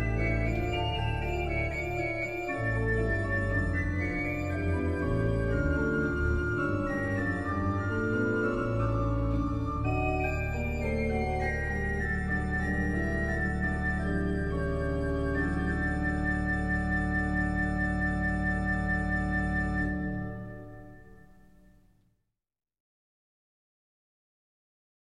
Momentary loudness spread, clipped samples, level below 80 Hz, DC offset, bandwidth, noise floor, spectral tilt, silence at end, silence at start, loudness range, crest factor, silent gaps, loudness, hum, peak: 3 LU; under 0.1%; -36 dBFS; 0.2%; 10 kHz; -80 dBFS; -7.5 dB/octave; 2.3 s; 0 s; 2 LU; 14 dB; none; -30 LUFS; none; -16 dBFS